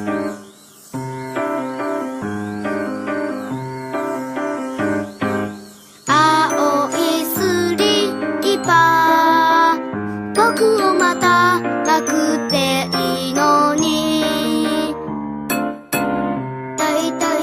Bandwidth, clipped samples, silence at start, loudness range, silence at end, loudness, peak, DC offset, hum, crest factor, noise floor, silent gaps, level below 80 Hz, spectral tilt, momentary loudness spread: 15.5 kHz; under 0.1%; 0 s; 9 LU; 0 s; -17 LUFS; -2 dBFS; under 0.1%; none; 16 dB; -43 dBFS; none; -54 dBFS; -4 dB/octave; 13 LU